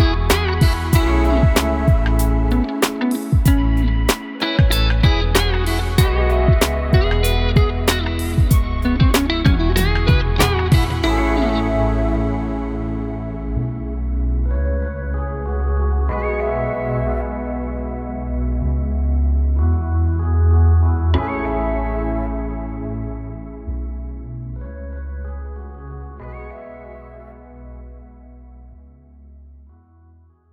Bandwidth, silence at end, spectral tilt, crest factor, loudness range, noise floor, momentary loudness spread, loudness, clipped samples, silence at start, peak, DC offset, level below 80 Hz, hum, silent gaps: 19 kHz; 1.05 s; -6 dB/octave; 16 dB; 15 LU; -50 dBFS; 16 LU; -19 LUFS; under 0.1%; 0 s; -2 dBFS; under 0.1%; -20 dBFS; none; none